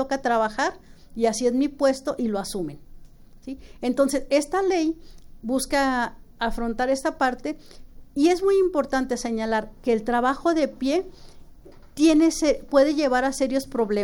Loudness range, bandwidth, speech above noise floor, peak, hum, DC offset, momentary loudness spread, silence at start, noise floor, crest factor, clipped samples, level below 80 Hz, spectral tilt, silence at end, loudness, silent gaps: 4 LU; 17.5 kHz; 23 dB; -6 dBFS; none; under 0.1%; 13 LU; 0 s; -46 dBFS; 16 dB; under 0.1%; -44 dBFS; -4 dB/octave; 0 s; -23 LUFS; none